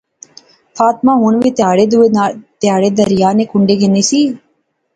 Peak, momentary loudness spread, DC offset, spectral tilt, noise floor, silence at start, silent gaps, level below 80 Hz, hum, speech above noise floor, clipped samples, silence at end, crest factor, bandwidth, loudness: 0 dBFS; 5 LU; under 0.1%; -5.5 dB/octave; -62 dBFS; 0.75 s; none; -52 dBFS; none; 51 dB; under 0.1%; 0.6 s; 12 dB; 9.2 kHz; -12 LUFS